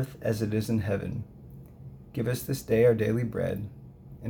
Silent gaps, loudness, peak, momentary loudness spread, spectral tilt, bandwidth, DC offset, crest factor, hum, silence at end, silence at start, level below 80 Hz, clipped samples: none; -28 LUFS; -12 dBFS; 24 LU; -7 dB/octave; over 20 kHz; under 0.1%; 18 dB; none; 0 s; 0 s; -52 dBFS; under 0.1%